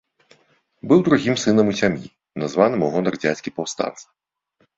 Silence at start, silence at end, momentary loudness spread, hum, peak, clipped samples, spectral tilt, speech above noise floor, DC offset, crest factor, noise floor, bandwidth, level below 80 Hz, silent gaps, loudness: 0.85 s; 0.75 s; 12 LU; none; -2 dBFS; under 0.1%; -5.5 dB/octave; 46 dB; under 0.1%; 18 dB; -66 dBFS; 7.8 kHz; -58 dBFS; none; -20 LUFS